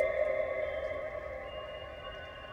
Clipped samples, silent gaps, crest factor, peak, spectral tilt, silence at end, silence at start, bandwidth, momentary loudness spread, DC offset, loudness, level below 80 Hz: under 0.1%; none; 20 dB; -16 dBFS; -5.5 dB/octave; 0 s; 0 s; 7.8 kHz; 12 LU; under 0.1%; -37 LUFS; -54 dBFS